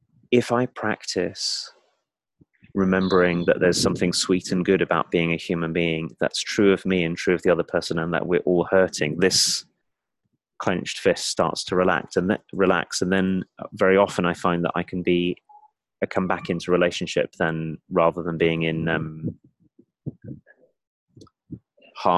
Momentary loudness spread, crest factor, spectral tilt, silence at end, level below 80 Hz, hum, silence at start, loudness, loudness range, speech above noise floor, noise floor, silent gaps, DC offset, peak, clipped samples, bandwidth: 10 LU; 18 dB; -4.5 dB/octave; 0 s; -52 dBFS; none; 0.3 s; -22 LUFS; 4 LU; 57 dB; -79 dBFS; 20.87-21.07 s; under 0.1%; -4 dBFS; under 0.1%; 12.5 kHz